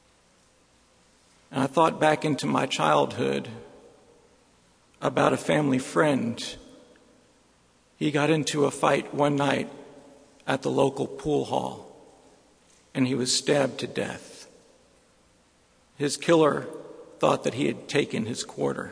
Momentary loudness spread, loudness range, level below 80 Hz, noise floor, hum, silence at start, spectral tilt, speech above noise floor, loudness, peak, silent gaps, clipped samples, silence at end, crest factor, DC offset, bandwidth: 14 LU; 3 LU; -64 dBFS; -62 dBFS; none; 1.5 s; -4.5 dB/octave; 37 dB; -25 LUFS; -4 dBFS; none; under 0.1%; 0 s; 22 dB; under 0.1%; 11 kHz